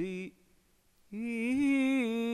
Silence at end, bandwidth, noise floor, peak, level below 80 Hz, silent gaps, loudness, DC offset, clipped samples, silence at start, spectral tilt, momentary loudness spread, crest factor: 0 s; 12.5 kHz; -68 dBFS; -22 dBFS; -68 dBFS; none; -31 LUFS; under 0.1%; under 0.1%; 0 s; -5.5 dB/octave; 17 LU; 12 dB